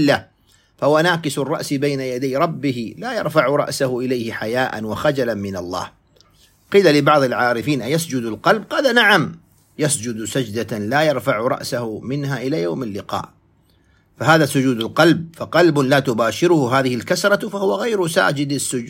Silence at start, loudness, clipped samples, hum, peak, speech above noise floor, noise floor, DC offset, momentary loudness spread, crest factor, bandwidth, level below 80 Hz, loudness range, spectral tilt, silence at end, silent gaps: 0 s; -18 LUFS; under 0.1%; none; 0 dBFS; 39 dB; -57 dBFS; under 0.1%; 11 LU; 18 dB; 16.5 kHz; -58 dBFS; 5 LU; -5 dB/octave; 0 s; none